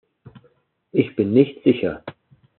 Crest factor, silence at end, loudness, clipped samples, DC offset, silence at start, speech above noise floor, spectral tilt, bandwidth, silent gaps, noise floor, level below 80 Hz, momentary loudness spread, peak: 20 dB; 0.5 s; -20 LUFS; under 0.1%; under 0.1%; 0.95 s; 42 dB; -7 dB/octave; 4.3 kHz; none; -60 dBFS; -62 dBFS; 15 LU; -2 dBFS